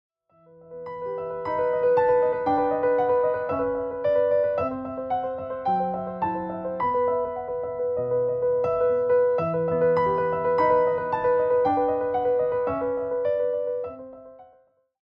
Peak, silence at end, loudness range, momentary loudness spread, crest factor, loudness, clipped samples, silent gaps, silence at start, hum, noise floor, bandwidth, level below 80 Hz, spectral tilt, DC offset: -10 dBFS; 0.6 s; 4 LU; 9 LU; 14 dB; -24 LUFS; under 0.1%; none; 0.65 s; none; -61 dBFS; 5.4 kHz; -58 dBFS; -9 dB/octave; under 0.1%